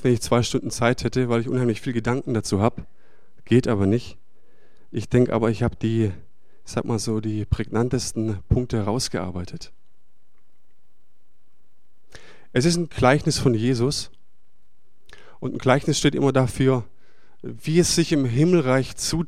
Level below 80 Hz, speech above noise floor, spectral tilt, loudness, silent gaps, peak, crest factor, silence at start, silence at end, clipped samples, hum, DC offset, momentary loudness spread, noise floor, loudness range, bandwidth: -42 dBFS; 49 dB; -5.5 dB/octave; -22 LUFS; none; -2 dBFS; 22 dB; 0 s; 0 s; under 0.1%; none; 1%; 13 LU; -70 dBFS; 7 LU; 15 kHz